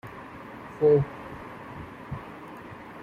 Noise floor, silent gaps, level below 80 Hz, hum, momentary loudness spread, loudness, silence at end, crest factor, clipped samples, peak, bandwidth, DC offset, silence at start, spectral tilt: -43 dBFS; none; -56 dBFS; none; 21 LU; -26 LUFS; 0 s; 18 dB; under 0.1%; -12 dBFS; 5.6 kHz; under 0.1%; 0.05 s; -9 dB/octave